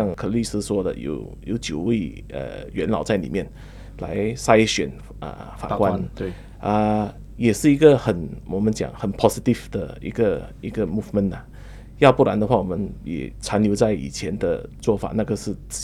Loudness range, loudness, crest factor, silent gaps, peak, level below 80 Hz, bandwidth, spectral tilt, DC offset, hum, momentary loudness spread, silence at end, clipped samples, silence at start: 5 LU; -22 LUFS; 22 dB; none; 0 dBFS; -40 dBFS; 14.5 kHz; -6 dB/octave; under 0.1%; none; 15 LU; 0 s; under 0.1%; 0 s